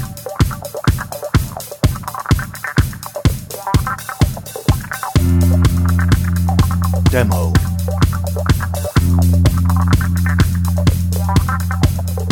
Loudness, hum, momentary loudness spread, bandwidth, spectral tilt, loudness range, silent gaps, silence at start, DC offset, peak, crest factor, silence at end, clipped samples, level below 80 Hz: -16 LUFS; none; 6 LU; 18 kHz; -6 dB/octave; 4 LU; none; 0 s; under 0.1%; -2 dBFS; 14 dB; 0 s; under 0.1%; -24 dBFS